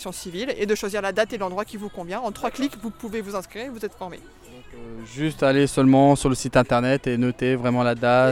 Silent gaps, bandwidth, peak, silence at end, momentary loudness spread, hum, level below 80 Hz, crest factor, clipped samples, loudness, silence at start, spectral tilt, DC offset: none; 16 kHz; -6 dBFS; 0 s; 16 LU; none; -46 dBFS; 16 dB; under 0.1%; -22 LUFS; 0 s; -6 dB/octave; under 0.1%